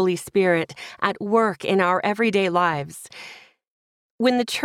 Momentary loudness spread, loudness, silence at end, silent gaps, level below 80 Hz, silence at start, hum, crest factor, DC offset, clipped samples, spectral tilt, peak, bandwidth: 16 LU; -21 LUFS; 0 s; 3.71-4.18 s; -66 dBFS; 0 s; none; 18 dB; under 0.1%; under 0.1%; -5 dB/octave; -4 dBFS; 16 kHz